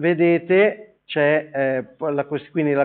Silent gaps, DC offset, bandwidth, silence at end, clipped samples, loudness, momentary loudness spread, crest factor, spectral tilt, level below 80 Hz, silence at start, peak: none; under 0.1%; 4.3 kHz; 0 s; under 0.1%; -20 LUFS; 9 LU; 14 dB; -5 dB/octave; -72 dBFS; 0 s; -4 dBFS